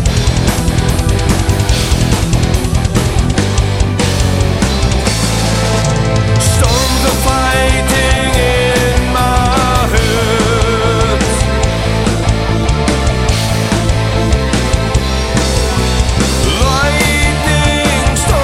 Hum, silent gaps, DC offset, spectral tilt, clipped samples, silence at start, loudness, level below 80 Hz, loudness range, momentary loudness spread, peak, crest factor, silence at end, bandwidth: none; none; under 0.1%; -4.5 dB/octave; under 0.1%; 0 s; -12 LUFS; -16 dBFS; 2 LU; 3 LU; 0 dBFS; 12 dB; 0 s; 16 kHz